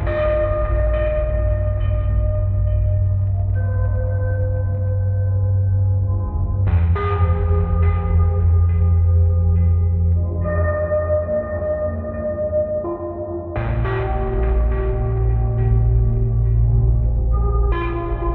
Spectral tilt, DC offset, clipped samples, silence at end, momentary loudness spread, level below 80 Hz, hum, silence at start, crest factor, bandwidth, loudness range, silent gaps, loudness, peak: -9.5 dB/octave; under 0.1%; under 0.1%; 0 s; 6 LU; -22 dBFS; none; 0 s; 12 dB; 3.8 kHz; 5 LU; none; -20 LUFS; -6 dBFS